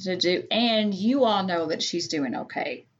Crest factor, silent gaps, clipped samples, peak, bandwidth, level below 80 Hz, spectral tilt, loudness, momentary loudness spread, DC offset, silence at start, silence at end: 16 dB; none; under 0.1%; -10 dBFS; 7.8 kHz; -78 dBFS; -4 dB/octave; -25 LUFS; 8 LU; under 0.1%; 0 s; 0.2 s